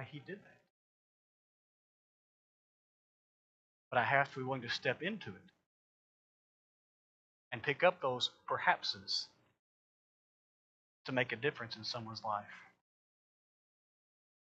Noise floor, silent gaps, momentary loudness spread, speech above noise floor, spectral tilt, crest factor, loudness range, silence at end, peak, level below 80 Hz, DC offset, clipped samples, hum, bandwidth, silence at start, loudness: under -90 dBFS; 0.70-3.91 s, 5.66-7.51 s, 9.59-11.05 s; 19 LU; over 53 dB; -4 dB/octave; 26 dB; 7 LU; 1.8 s; -16 dBFS; -86 dBFS; under 0.1%; under 0.1%; none; 8.2 kHz; 0 s; -36 LUFS